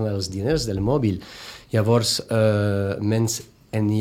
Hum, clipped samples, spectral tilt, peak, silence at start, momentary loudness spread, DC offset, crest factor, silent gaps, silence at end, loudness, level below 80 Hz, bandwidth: none; under 0.1%; -5.5 dB/octave; -6 dBFS; 0 s; 11 LU; under 0.1%; 16 dB; none; 0 s; -22 LUFS; -46 dBFS; 16 kHz